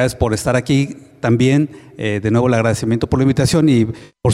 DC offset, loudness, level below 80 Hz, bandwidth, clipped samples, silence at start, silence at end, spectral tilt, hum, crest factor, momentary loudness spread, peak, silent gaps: under 0.1%; -16 LUFS; -38 dBFS; 13.5 kHz; under 0.1%; 0 s; 0 s; -6.5 dB/octave; none; 12 dB; 9 LU; -4 dBFS; none